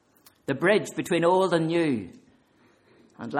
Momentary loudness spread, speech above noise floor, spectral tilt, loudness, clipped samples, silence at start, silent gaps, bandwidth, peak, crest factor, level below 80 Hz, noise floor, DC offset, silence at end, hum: 17 LU; 38 dB; -5.5 dB/octave; -24 LUFS; under 0.1%; 0.5 s; none; 14.5 kHz; -10 dBFS; 18 dB; -68 dBFS; -62 dBFS; under 0.1%; 0 s; none